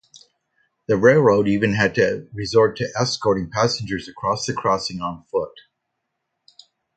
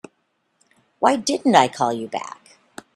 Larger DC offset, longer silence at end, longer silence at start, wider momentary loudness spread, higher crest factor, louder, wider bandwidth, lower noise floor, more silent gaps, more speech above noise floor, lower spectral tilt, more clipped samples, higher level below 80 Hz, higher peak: neither; first, 1.35 s vs 0.65 s; about the same, 0.9 s vs 1 s; about the same, 12 LU vs 14 LU; about the same, 20 dB vs 22 dB; about the same, -20 LUFS vs -20 LUFS; second, 9.2 kHz vs 13.5 kHz; first, -77 dBFS vs -70 dBFS; neither; first, 58 dB vs 51 dB; about the same, -5 dB/octave vs -4 dB/octave; neither; first, -52 dBFS vs -64 dBFS; about the same, 0 dBFS vs 0 dBFS